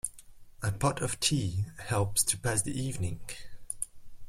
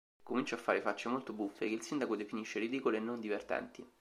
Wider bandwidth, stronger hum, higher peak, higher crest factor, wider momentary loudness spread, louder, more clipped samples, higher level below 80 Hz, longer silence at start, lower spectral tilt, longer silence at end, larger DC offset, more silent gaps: first, 16.5 kHz vs 14 kHz; neither; first, -12 dBFS vs -16 dBFS; about the same, 20 dB vs 22 dB; first, 13 LU vs 5 LU; first, -31 LUFS vs -38 LUFS; neither; first, -50 dBFS vs -78 dBFS; second, 0.05 s vs 0.25 s; about the same, -3.5 dB/octave vs -4.5 dB/octave; about the same, 0 s vs 0.1 s; neither; neither